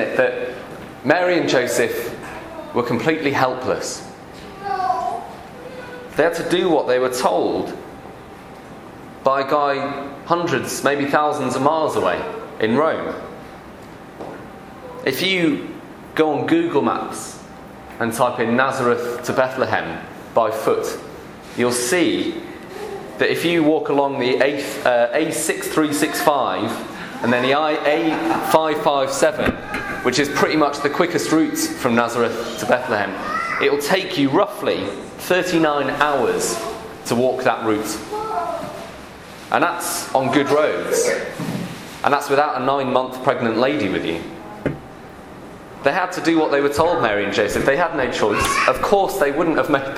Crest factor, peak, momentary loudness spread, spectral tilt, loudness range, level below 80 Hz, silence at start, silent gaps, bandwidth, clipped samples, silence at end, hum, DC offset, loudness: 20 dB; 0 dBFS; 17 LU; -4 dB/octave; 4 LU; -48 dBFS; 0 s; none; 16 kHz; under 0.1%; 0 s; none; under 0.1%; -19 LUFS